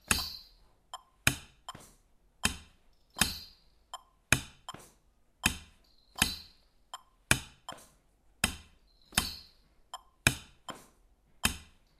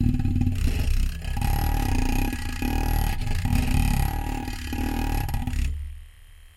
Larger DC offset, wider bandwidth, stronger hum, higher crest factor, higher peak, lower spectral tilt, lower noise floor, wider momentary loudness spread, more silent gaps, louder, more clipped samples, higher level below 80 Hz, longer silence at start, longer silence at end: neither; about the same, 15.5 kHz vs 16.5 kHz; neither; first, 34 dB vs 16 dB; first, -4 dBFS vs -8 dBFS; second, -2 dB/octave vs -5.5 dB/octave; first, -67 dBFS vs -47 dBFS; first, 20 LU vs 7 LU; neither; second, -32 LUFS vs -27 LUFS; neither; second, -50 dBFS vs -26 dBFS; about the same, 0.1 s vs 0 s; first, 0.35 s vs 0.1 s